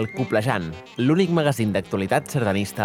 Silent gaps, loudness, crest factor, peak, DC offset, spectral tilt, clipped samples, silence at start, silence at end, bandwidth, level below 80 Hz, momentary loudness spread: none; -22 LUFS; 18 dB; -4 dBFS; under 0.1%; -6 dB/octave; under 0.1%; 0 s; 0 s; 17.5 kHz; -58 dBFS; 6 LU